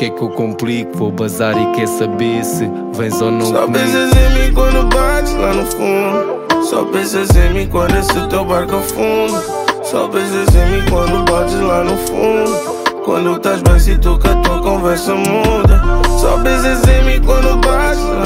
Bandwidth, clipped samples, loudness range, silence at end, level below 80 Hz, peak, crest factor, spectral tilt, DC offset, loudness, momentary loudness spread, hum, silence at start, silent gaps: 16.5 kHz; under 0.1%; 2 LU; 0 s; -16 dBFS; 0 dBFS; 12 dB; -5.5 dB/octave; under 0.1%; -14 LUFS; 6 LU; none; 0 s; none